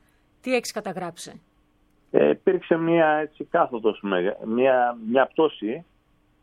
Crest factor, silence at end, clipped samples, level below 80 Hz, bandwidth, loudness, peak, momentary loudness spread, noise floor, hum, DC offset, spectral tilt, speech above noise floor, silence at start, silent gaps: 22 dB; 0.6 s; under 0.1%; -66 dBFS; 15 kHz; -23 LUFS; -2 dBFS; 13 LU; -63 dBFS; none; under 0.1%; -5.5 dB/octave; 40 dB; 0.45 s; none